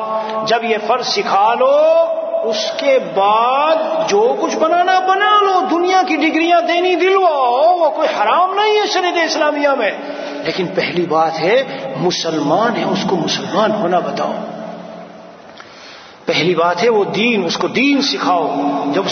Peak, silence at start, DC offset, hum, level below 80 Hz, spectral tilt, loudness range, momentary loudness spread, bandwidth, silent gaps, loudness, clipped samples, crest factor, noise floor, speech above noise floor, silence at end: -2 dBFS; 0 s; under 0.1%; none; -66 dBFS; -4 dB/octave; 6 LU; 8 LU; 6.6 kHz; none; -14 LUFS; under 0.1%; 14 dB; -37 dBFS; 23 dB; 0 s